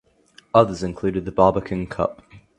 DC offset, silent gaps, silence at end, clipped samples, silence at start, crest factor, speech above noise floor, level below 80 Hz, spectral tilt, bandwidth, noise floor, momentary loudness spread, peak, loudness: under 0.1%; none; 0.2 s; under 0.1%; 0.55 s; 22 dB; 34 dB; -44 dBFS; -7.5 dB/octave; 10 kHz; -54 dBFS; 8 LU; 0 dBFS; -21 LUFS